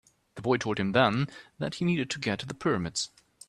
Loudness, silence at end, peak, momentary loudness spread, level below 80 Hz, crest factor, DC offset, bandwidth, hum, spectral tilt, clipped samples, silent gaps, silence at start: -29 LUFS; 0.4 s; -8 dBFS; 12 LU; -62 dBFS; 22 dB; under 0.1%; 11.5 kHz; none; -5 dB/octave; under 0.1%; none; 0.35 s